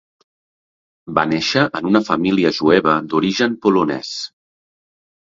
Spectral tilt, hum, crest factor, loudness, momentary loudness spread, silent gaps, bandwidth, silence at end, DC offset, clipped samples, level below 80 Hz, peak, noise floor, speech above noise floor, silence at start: -5.5 dB/octave; none; 18 dB; -17 LUFS; 9 LU; none; 7.8 kHz; 1.15 s; under 0.1%; under 0.1%; -56 dBFS; 0 dBFS; under -90 dBFS; over 74 dB; 1.05 s